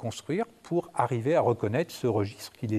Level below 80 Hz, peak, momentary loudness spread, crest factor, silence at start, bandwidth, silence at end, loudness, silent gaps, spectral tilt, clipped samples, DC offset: -70 dBFS; -10 dBFS; 7 LU; 18 dB; 0 s; 14.5 kHz; 0 s; -29 LUFS; none; -6.5 dB/octave; under 0.1%; under 0.1%